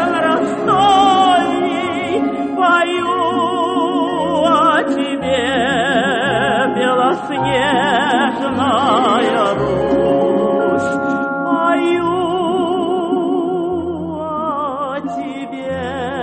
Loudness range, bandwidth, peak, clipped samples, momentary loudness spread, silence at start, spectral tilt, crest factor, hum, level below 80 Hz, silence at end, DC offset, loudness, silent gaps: 4 LU; 9 kHz; -2 dBFS; under 0.1%; 9 LU; 0 s; -5 dB/octave; 14 dB; none; -48 dBFS; 0 s; under 0.1%; -16 LUFS; none